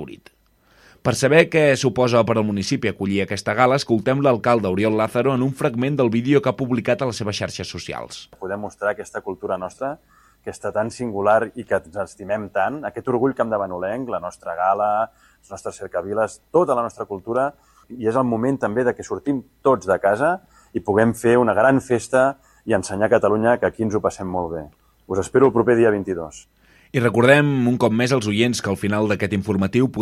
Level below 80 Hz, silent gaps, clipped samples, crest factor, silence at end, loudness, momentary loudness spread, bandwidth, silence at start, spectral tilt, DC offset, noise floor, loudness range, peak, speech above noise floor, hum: -54 dBFS; none; under 0.1%; 20 dB; 0 s; -20 LUFS; 13 LU; 15 kHz; 0 s; -6 dB/octave; under 0.1%; -57 dBFS; 6 LU; 0 dBFS; 37 dB; none